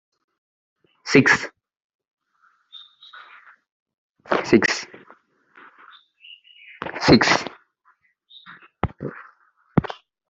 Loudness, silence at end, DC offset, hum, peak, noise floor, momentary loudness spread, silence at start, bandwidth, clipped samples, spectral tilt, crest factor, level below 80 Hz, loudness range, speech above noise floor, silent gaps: -19 LUFS; 0.35 s; under 0.1%; none; -2 dBFS; -63 dBFS; 28 LU; 1.05 s; 8 kHz; under 0.1%; -5 dB/octave; 24 dB; -52 dBFS; 3 LU; 46 dB; 1.84-1.99 s, 2.11-2.17 s, 3.72-3.86 s, 3.94-4.15 s